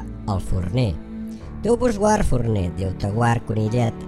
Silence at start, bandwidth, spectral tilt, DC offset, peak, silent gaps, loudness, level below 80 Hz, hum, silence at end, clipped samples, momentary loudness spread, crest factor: 0 s; 12.5 kHz; -7 dB/octave; under 0.1%; -6 dBFS; none; -22 LUFS; -32 dBFS; none; 0 s; under 0.1%; 10 LU; 14 dB